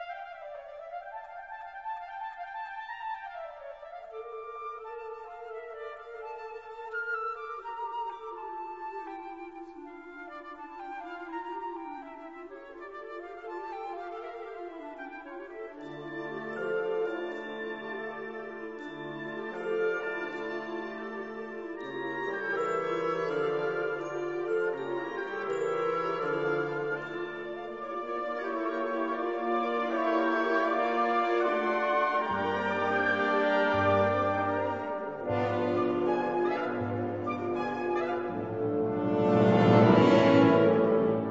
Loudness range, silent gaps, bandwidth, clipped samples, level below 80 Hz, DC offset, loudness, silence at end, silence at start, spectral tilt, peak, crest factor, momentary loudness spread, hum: 14 LU; none; 7.8 kHz; under 0.1%; -68 dBFS; under 0.1%; -30 LUFS; 0 s; 0 s; -7.5 dB/octave; -8 dBFS; 22 dB; 17 LU; none